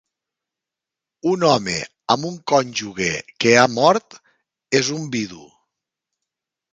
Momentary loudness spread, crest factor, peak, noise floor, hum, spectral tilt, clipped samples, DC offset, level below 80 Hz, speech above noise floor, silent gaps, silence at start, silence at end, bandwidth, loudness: 12 LU; 20 dB; -2 dBFS; -87 dBFS; none; -4 dB/octave; under 0.1%; under 0.1%; -58 dBFS; 68 dB; none; 1.25 s; 1.3 s; 9.6 kHz; -19 LUFS